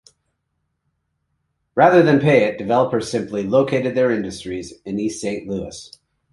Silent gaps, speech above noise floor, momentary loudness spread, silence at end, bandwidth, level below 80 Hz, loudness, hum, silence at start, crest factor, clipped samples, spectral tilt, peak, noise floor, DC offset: none; 55 dB; 15 LU; 0.45 s; 11.5 kHz; -54 dBFS; -18 LUFS; none; 1.75 s; 18 dB; under 0.1%; -6 dB/octave; -2 dBFS; -73 dBFS; under 0.1%